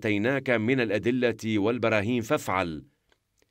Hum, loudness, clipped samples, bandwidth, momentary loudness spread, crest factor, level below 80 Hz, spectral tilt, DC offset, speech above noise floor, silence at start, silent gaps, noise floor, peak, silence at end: none; -26 LUFS; under 0.1%; 16 kHz; 4 LU; 18 dB; -62 dBFS; -6 dB/octave; under 0.1%; 44 dB; 0 s; none; -70 dBFS; -8 dBFS; 0.65 s